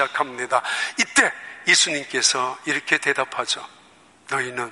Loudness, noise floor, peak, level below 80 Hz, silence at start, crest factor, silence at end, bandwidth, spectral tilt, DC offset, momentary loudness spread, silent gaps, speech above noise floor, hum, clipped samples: -21 LUFS; -52 dBFS; -2 dBFS; -70 dBFS; 0 s; 20 dB; 0 s; 11.5 kHz; -0.5 dB/octave; under 0.1%; 9 LU; none; 30 dB; none; under 0.1%